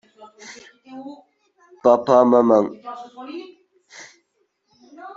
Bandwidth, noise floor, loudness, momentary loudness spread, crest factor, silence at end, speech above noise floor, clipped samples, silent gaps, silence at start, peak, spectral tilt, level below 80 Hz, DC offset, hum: 7.6 kHz; -69 dBFS; -16 LUFS; 27 LU; 20 dB; 0.05 s; 53 dB; under 0.1%; none; 0.45 s; -2 dBFS; -6.5 dB/octave; -70 dBFS; under 0.1%; none